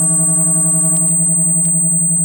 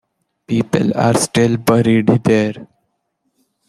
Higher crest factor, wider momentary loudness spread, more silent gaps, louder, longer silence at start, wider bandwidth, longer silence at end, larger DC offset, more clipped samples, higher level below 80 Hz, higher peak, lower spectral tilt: second, 8 dB vs 14 dB; second, 0 LU vs 8 LU; neither; first, -10 LUFS vs -15 LUFS; second, 0 s vs 0.5 s; first, 17 kHz vs 14.5 kHz; second, 0 s vs 1.05 s; neither; neither; about the same, -52 dBFS vs -52 dBFS; about the same, -4 dBFS vs -2 dBFS; about the same, -5 dB/octave vs -6 dB/octave